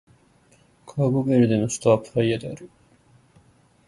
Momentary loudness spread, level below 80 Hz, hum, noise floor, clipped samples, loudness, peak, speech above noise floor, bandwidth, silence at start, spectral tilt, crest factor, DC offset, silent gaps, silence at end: 16 LU; -58 dBFS; none; -58 dBFS; under 0.1%; -22 LUFS; -4 dBFS; 37 dB; 11.5 kHz; 0.85 s; -6.5 dB/octave; 20 dB; under 0.1%; none; 1.2 s